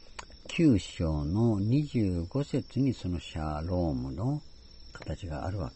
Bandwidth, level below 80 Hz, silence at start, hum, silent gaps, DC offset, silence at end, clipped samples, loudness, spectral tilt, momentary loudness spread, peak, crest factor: 8.2 kHz; -44 dBFS; 0.05 s; none; none; under 0.1%; 0 s; under 0.1%; -31 LUFS; -7.5 dB/octave; 13 LU; -12 dBFS; 18 dB